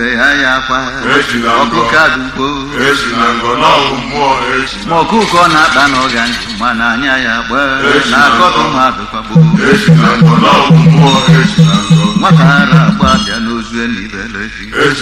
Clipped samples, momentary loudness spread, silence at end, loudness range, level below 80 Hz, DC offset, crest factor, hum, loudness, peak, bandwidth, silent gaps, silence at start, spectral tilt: 0.4%; 9 LU; 0 s; 4 LU; -32 dBFS; under 0.1%; 8 dB; none; -9 LUFS; 0 dBFS; 12 kHz; none; 0 s; -5.5 dB/octave